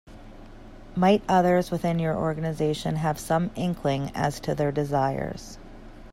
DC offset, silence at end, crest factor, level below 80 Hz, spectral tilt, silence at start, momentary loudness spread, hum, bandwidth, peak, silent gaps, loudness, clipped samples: under 0.1%; 0 s; 18 dB; -46 dBFS; -6.5 dB/octave; 0.05 s; 12 LU; none; 16 kHz; -8 dBFS; none; -25 LUFS; under 0.1%